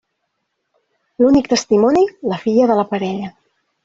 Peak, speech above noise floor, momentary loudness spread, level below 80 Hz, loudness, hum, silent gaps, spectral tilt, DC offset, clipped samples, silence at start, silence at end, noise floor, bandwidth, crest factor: -2 dBFS; 58 dB; 10 LU; -52 dBFS; -16 LUFS; none; none; -5.5 dB/octave; under 0.1%; under 0.1%; 1.2 s; 0.55 s; -72 dBFS; 7.8 kHz; 14 dB